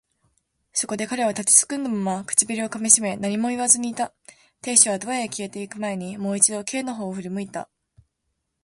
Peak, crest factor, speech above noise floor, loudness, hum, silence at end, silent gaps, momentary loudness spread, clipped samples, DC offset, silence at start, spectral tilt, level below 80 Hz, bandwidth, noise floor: 0 dBFS; 24 dB; 54 dB; -21 LUFS; none; 1 s; none; 15 LU; under 0.1%; under 0.1%; 0.75 s; -2.5 dB/octave; -66 dBFS; 12 kHz; -77 dBFS